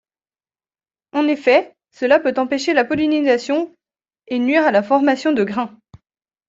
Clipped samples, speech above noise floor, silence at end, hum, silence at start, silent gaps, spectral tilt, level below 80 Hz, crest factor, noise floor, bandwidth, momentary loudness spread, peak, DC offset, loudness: under 0.1%; over 73 dB; 0.8 s; none; 1.15 s; none; -5 dB/octave; -62 dBFS; 16 dB; under -90 dBFS; 7.8 kHz; 10 LU; -2 dBFS; under 0.1%; -17 LUFS